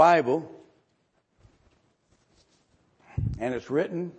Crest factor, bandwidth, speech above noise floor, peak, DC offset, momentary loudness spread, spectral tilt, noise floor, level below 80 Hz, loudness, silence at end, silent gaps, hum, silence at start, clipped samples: 22 dB; 8.4 kHz; 47 dB; -6 dBFS; under 0.1%; 14 LU; -7 dB/octave; -71 dBFS; -50 dBFS; -27 LUFS; 0.1 s; none; none; 0 s; under 0.1%